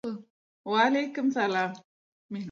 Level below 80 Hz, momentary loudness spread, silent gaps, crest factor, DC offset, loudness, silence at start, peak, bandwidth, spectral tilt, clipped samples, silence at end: -80 dBFS; 19 LU; 0.30-0.64 s, 1.85-2.29 s; 18 dB; under 0.1%; -27 LUFS; 0.05 s; -12 dBFS; 7.4 kHz; -5 dB/octave; under 0.1%; 0 s